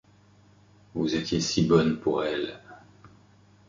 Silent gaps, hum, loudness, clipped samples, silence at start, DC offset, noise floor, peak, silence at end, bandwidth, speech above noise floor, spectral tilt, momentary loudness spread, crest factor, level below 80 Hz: none; 50 Hz at -50 dBFS; -26 LUFS; under 0.1%; 0.95 s; under 0.1%; -58 dBFS; -8 dBFS; 0.6 s; 7.6 kHz; 33 dB; -5.5 dB/octave; 14 LU; 20 dB; -54 dBFS